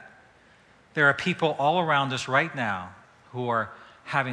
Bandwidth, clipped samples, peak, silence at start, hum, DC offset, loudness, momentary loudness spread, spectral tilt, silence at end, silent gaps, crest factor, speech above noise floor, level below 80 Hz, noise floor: 11 kHz; under 0.1%; -6 dBFS; 0 s; none; under 0.1%; -25 LUFS; 14 LU; -5 dB/octave; 0 s; none; 20 dB; 32 dB; -68 dBFS; -57 dBFS